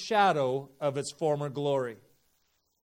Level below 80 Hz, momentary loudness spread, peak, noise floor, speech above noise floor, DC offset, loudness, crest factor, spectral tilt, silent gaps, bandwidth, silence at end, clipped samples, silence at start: -76 dBFS; 8 LU; -12 dBFS; -74 dBFS; 45 dB; under 0.1%; -30 LUFS; 20 dB; -5 dB/octave; none; 16 kHz; 0.9 s; under 0.1%; 0 s